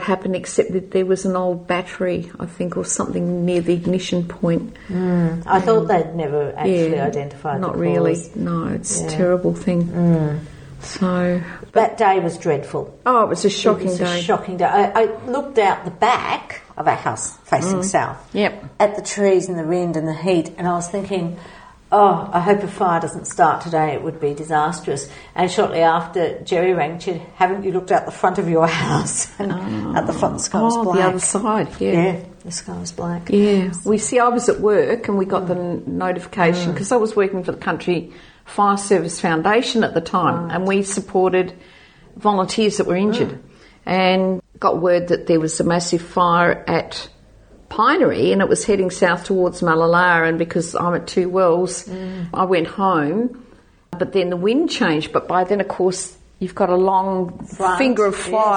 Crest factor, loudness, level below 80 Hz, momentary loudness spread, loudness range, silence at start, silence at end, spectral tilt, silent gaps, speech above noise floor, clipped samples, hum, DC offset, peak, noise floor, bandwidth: 18 dB; -19 LUFS; -50 dBFS; 9 LU; 3 LU; 0 s; 0 s; -5 dB/octave; none; 28 dB; under 0.1%; none; under 0.1%; -2 dBFS; -47 dBFS; 9.8 kHz